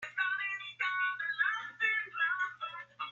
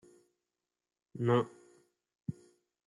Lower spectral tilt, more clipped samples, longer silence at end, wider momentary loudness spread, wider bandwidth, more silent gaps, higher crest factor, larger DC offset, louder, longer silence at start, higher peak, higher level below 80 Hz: second, -0.5 dB/octave vs -8 dB/octave; neither; second, 0 s vs 0.55 s; second, 7 LU vs 22 LU; second, 7.2 kHz vs 11 kHz; neither; second, 16 dB vs 22 dB; neither; about the same, -33 LUFS vs -35 LUFS; second, 0 s vs 1.15 s; about the same, -18 dBFS vs -16 dBFS; second, -88 dBFS vs -76 dBFS